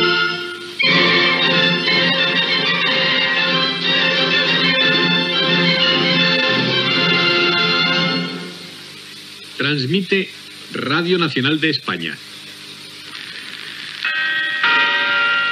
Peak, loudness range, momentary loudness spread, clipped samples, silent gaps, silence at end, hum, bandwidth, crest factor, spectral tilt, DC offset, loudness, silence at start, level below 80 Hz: -2 dBFS; 7 LU; 18 LU; under 0.1%; none; 0 s; none; 13.5 kHz; 16 dB; -4.5 dB/octave; under 0.1%; -15 LUFS; 0 s; -76 dBFS